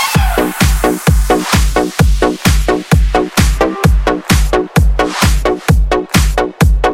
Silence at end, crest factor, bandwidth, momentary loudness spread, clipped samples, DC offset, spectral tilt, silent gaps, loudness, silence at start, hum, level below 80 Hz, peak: 0 s; 10 dB; 17 kHz; 1 LU; under 0.1%; under 0.1%; -5 dB/octave; none; -12 LUFS; 0 s; none; -14 dBFS; 0 dBFS